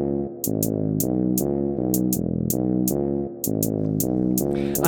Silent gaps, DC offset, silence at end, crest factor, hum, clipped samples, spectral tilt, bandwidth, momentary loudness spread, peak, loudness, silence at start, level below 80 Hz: none; under 0.1%; 0 s; 18 dB; none; under 0.1%; -6.5 dB/octave; 19 kHz; 4 LU; -6 dBFS; -23 LUFS; 0 s; -46 dBFS